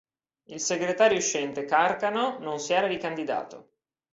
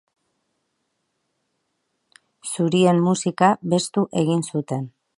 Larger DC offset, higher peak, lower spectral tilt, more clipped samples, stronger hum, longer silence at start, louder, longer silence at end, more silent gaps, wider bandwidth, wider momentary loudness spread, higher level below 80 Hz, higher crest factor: neither; second, -10 dBFS vs -2 dBFS; second, -2.5 dB/octave vs -5.5 dB/octave; neither; neither; second, 0.5 s vs 2.45 s; second, -26 LUFS vs -21 LUFS; first, 0.5 s vs 0.3 s; neither; second, 8 kHz vs 11.5 kHz; about the same, 11 LU vs 12 LU; about the same, -70 dBFS vs -68 dBFS; about the same, 18 dB vs 20 dB